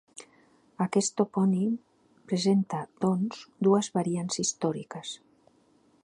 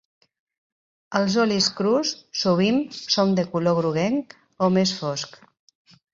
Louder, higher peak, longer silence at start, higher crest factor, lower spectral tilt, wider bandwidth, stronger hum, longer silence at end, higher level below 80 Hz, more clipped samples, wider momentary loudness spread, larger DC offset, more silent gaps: second, -28 LUFS vs -22 LUFS; second, -10 dBFS vs -6 dBFS; second, 0.15 s vs 1.1 s; about the same, 20 dB vs 18 dB; about the same, -5.5 dB/octave vs -5 dB/octave; first, 11 kHz vs 7.6 kHz; neither; about the same, 0.85 s vs 0.85 s; second, -74 dBFS vs -64 dBFS; neither; first, 14 LU vs 8 LU; neither; neither